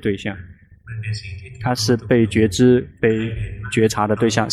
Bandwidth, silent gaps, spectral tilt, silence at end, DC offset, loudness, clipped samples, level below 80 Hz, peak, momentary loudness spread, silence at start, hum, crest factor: 14 kHz; none; -5.5 dB/octave; 0 s; under 0.1%; -19 LUFS; under 0.1%; -42 dBFS; -4 dBFS; 14 LU; 0.05 s; none; 16 dB